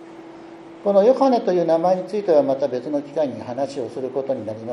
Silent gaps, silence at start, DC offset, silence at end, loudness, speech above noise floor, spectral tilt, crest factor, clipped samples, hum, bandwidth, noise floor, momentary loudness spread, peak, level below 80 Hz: none; 0 s; under 0.1%; 0 s; -20 LUFS; 20 dB; -7 dB/octave; 16 dB; under 0.1%; none; 10.5 kHz; -40 dBFS; 20 LU; -4 dBFS; -70 dBFS